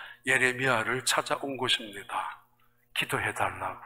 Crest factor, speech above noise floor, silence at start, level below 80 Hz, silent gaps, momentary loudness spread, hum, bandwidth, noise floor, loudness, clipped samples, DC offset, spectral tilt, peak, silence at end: 22 dB; 37 dB; 0 s; -64 dBFS; none; 11 LU; none; 16 kHz; -67 dBFS; -28 LUFS; under 0.1%; under 0.1%; -2.5 dB/octave; -8 dBFS; 0 s